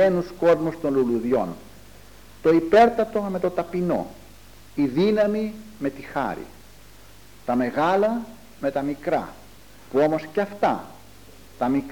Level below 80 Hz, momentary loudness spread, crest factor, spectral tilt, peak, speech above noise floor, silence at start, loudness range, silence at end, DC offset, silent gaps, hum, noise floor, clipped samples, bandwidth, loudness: -54 dBFS; 12 LU; 18 dB; -7 dB/octave; -4 dBFS; 27 dB; 0 s; 5 LU; 0 s; 0.4%; none; none; -49 dBFS; under 0.1%; 19 kHz; -23 LUFS